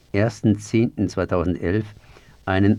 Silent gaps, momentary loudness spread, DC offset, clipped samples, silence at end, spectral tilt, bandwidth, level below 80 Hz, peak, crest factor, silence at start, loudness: none; 6 LU; under 0.1%; under 0.1%; 0 s; -7.5 dB/octave; 11 kHz; -44 dBFS; -4 dBFS; 16 dB; 0.15 s; -22 LUFS